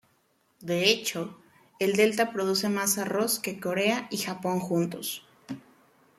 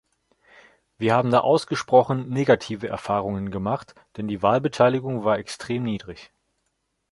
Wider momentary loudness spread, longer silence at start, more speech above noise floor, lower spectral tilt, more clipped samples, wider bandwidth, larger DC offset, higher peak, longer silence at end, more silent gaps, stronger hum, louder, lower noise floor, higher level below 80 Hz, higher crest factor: first, 16 LU vs 12 LU; second, 0.6 s vs 1 s; second, 41 dB vs 52 dB; second, -3.5 dB/octave vs -6.5 dB/octave; neither; first, 15.5 kHz vs 11.5 kHz; neither; about the same, -6 dBFS vs -4 dBFS; second, 0.6 s vs 0.85 s; neither; neither; second, -27 LUFS vs -23 LUFS; second, -69 dBFS vs -75 dBFS; second, -72 dBFS vs -56 dBFS; about the same, 22 dB vs 20 dB